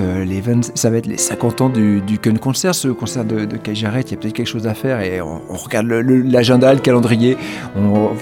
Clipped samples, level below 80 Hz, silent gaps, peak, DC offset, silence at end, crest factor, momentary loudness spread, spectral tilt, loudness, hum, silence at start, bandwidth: under 0.1%; -50 dBFS; none; 0 dBFS; under 0.1%; 0 s; 14 dB; 9 LU; -5.5 dB/octave; -16 LUFS; none; 0 s; 17.5 kHz